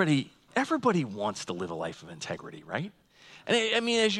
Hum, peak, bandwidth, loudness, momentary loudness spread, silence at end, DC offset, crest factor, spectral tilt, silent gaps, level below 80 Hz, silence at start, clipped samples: none; -10 dBFS; 12 kHz; -30 LUFS; 14 LU; 0 s; under 0.1%; 20 dB; -4.5 dB/octave; none; -72 dBFS; 0 s; under 0.1%